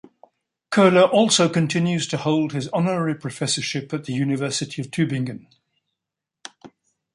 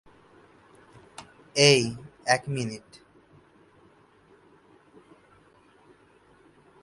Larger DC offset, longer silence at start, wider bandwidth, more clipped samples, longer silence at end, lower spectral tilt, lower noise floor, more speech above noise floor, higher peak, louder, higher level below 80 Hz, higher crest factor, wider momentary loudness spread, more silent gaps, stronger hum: neither; second, 0.7 s vs 1.2 s; about the same, 11.5 kHz vs 11.5 kHz; neither; second, 0.45 s vs 4.05 s; about the same, -4.5 dB/octave vs -3.5 dB/octave; first, -85 dBFS vs -59 dBFS; first, 65 dB vs 35 dB; about the same, -2 dBFS vs -2 dBFS; first, -21 LUFS vs -24 LUFS; about the same, -64 dBFS vs -66 dBFS; second, 20 dB vs 28 dB; second, 14 LU vs 28 LU; neither; neither